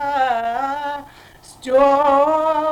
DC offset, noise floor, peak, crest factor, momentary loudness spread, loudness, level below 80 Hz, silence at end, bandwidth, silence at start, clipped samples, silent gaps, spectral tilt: under 0.1%; -44 dBFS; -4 dBFS; 14 dB; 14 LU; -17 LUFS; -50 dBFS; 0 s; 13.5 kHz; 0 s; under 0.1%; none; -4.5 dB/octave